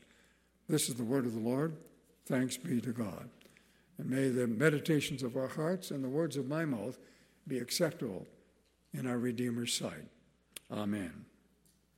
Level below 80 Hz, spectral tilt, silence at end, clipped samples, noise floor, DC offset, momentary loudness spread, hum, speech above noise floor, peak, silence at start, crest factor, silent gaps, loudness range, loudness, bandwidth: -74 dBFS; -5 dB/octave; 0.7 s; under 0.1%; -70 dBFS; under 0.1%; 19 LU; none; 35 dB; -12 dBFS; 0.7 s; 24 dB; none; 5 LU; -35 LUFS; 16 kHz